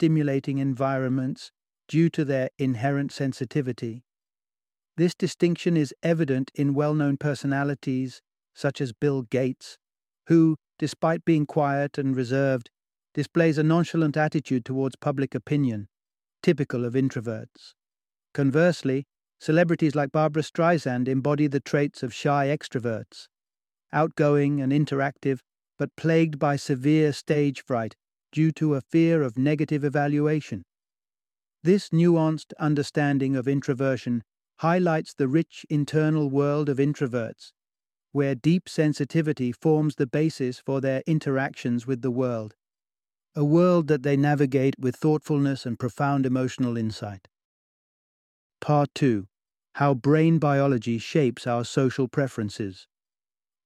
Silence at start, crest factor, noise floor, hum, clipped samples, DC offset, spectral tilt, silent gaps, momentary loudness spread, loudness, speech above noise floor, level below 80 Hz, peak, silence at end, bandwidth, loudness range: 0 s; 18 dB; under -90 dBFS; none; under 0.1%; under 0.1%; -7.5 dB/octave; 47.45-48.50 s; 9 LU; -25 LUFS; over 66 dB; -66 dBFS; -6 dBFS; 0.85 s; 11.5 kHz; 4 LU